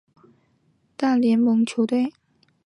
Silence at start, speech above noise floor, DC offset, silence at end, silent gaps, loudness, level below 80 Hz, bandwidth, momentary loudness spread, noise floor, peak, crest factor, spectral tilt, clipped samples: 1 s; 45 dB; under 0.1%; 0.55 s; none; -21 LUFS; -76 dBFS; 10.5 kHz; 7 LU; -65 dBFS; -10 dBFS; 12 dB; -6 dB/octave; under 0.1%